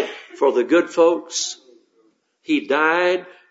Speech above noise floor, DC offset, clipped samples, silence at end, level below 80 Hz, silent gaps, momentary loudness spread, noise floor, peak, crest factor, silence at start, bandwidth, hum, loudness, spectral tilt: 43 dB; under 0.1%; under 0.1%; 0.2 s; -80 dBFS; none; 11 LU; -62 dBFS; -4 dBFS; 18 dB; 0 s; 8 kHz; none; -19 LUFS; -2.5 dB/octave